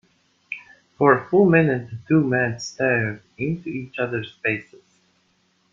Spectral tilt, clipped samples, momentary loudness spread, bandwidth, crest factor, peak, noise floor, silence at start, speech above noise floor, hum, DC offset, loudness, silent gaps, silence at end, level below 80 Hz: -7 dB/octave; under 0.1%; 14 LU; 7.4 kHz; 20 dB; -2 dBFS; -65 dBFS; 0.5 s; 44 dB; none; under 0.1%; -21 LUFS; none; 1.1 s; -60 dBFS